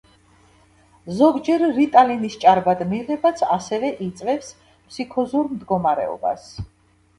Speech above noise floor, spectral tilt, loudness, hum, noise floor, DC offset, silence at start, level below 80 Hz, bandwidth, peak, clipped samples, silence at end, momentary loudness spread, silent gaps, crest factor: 35 dB; -6 dB/octave; -20 LUFS; none; -54 dBFS; under 0.1%; 1.05 s; -54 dBFS; 11.5 kHz; 0 dBFS; under 0.1%; 0.55 s; 16 LU; none; 20 dB